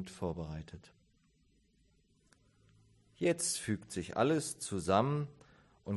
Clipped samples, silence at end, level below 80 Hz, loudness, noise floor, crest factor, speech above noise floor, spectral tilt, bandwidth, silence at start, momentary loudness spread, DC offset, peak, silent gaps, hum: under 0.1%; 0 s; -60 dBFS; -35 LUFS; -71 dBFS; 22 dB; 36 dB; -5 dB/octave; 12 kHz; 0 s; 16 LU; under 0.1%; -16 dBFS; none; none